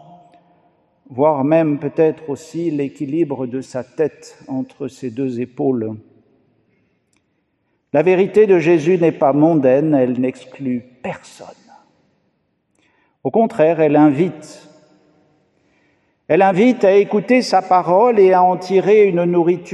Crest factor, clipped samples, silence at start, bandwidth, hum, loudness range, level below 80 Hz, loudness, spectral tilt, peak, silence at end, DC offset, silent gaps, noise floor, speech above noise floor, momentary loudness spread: 16 dB; under 0.1%; 1.1 s; 10 kHz; none; 11 LU; -66 dBFS; -15 LUFS; -7.5 dB/octave; -2 dBFS; 0 s; under 0.1%; none; -67 dBFS; 52 dB; 15 LU